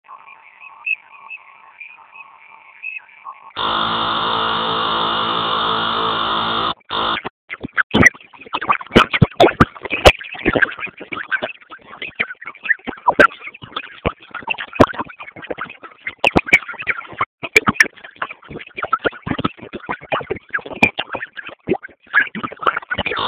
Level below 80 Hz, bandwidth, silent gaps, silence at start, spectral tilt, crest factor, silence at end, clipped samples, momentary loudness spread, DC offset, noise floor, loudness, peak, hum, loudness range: -38 dBFS; 16 kHz; 7.30-7.48 s, 7.83-7.90 s, 17.26-17.38 s; 0.1 s; -4.5 dB/octave; 20 dB; 0 s; 0.2%; 18 LU; under 0.1%; -44 dBFS; -18 LUFS; 0 dBFS; none; 6 LU